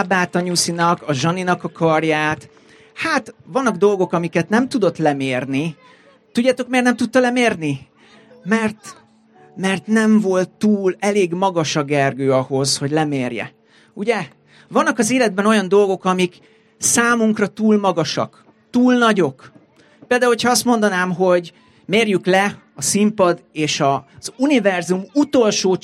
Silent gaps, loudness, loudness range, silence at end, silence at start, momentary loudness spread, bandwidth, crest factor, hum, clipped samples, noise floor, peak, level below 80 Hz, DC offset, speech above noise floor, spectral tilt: none; -17 LUFS; 3 LU; 0.05 s; 0 s; 8 LU; 15 kHz; 16 dB; none; under 0.1%; -49 dBFS; -2 dBFS; -62 dBFS; under 0.1%; 32 dB; -4.5 dB/octave